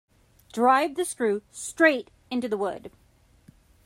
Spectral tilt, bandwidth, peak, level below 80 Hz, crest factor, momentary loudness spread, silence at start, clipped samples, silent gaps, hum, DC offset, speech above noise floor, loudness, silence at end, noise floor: -3.5 dB/octave; 16 kHz; -6 dBFS; -64 dBFS; 22 dB; 14 LU; 0.55 s; under 0.1%; none; none; under 0.1%; 32 dB; -25 LUFS; 0.95 s; -57 dBFS